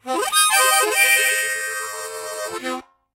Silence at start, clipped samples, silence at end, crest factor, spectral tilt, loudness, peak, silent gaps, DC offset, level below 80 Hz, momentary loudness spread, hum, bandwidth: 0.05 s; under 0.1%; 0.35 s; 18 dB; 2 dB/octave; -17 LUFS; -2 dBFS; none; under 0.1%; -70 dBFS; 15 LU; none; 16 kHz